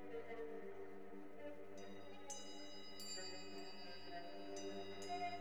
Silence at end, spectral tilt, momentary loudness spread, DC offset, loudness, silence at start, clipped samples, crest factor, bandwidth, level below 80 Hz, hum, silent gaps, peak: 0 s; -3 dB/octave; 7 LU; 0.3%; -52 LUFS; 0 s; under 0.1%; 16 dB; over 20 kHz; -80 dBFS; 50 Hz at -80 dBFS; none; -36 dBFS